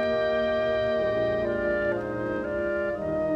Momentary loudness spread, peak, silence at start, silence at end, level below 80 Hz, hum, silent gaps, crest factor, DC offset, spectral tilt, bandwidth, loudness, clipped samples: 4 LU; -14 dBFS; 0 s; 0 s; -48 dBFS; none; none; 12 dB; under 0.1%; -7 dB/octave; 6.8 kHz; -27 LUFS; under 0.1%